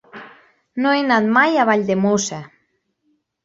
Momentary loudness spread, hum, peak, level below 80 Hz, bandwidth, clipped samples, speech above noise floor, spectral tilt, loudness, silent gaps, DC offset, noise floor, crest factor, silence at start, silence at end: 19 LU; none; -2 dBFS; -62 dBFS; 8 kHz; under 0.1%; 51 dB; -4.5 dB/octave; -17 LUFS; none; under 0.1%; -68 dBFS; 18 dB; 0.15 s; 1 s